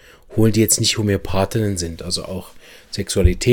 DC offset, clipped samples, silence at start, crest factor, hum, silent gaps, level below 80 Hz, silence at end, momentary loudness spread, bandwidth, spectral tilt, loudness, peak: under 0.1%; under 0.1%; 0.3 s; 18 dB; none; none; -28 dBFS; 0 s; 14 LU; 17.5 kHz; -4.5 dB/octave; -19 LUFS; 0 dBFS